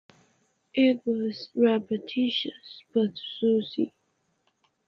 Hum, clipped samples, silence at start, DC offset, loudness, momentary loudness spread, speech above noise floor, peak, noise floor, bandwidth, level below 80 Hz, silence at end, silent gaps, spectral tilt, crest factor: none; under 0.1%; 0.75 s; under 0.1%; -27 LUFS; 9 LU; 47 dB; -10 dBFS; -73 dBFS; 6.2 kHz; -76 dBFS; 1 s; none; -7 dB/octave; 18 dB